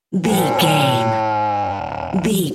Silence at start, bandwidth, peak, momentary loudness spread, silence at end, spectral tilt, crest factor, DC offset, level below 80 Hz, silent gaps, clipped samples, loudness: 0.1 s; 16.5 kHz; -2 dBFS; 8 LU; 0 s; -5 dB/octave; 16 dB; under 0.1%; -48 dBFS; none; under 0.1%; -18 LUFS